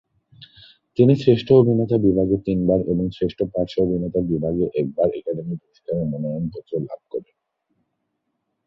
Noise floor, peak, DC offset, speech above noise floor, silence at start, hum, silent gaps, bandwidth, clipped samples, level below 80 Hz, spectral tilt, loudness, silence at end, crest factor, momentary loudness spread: -75 dBFS; -2 dBFS; under 0.1%; 55 dB; 0.4 s; none; none; 6.8 kHz; under 0.1%; -46 dBFS; -10 dB/octave; -21 LUFS; 1.45 s; 20 dB; 14 LU